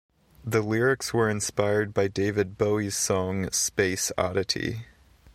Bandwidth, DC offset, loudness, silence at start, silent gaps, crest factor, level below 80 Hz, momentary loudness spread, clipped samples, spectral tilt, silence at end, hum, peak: 15.5 kHz; under 0.1%; -26 LUFS; 0.45 s; none; 20 dB; -54 dBFS; 4 LU; under 0.1%; -4 dB/octave; 0.05 s; none; -8 dBFS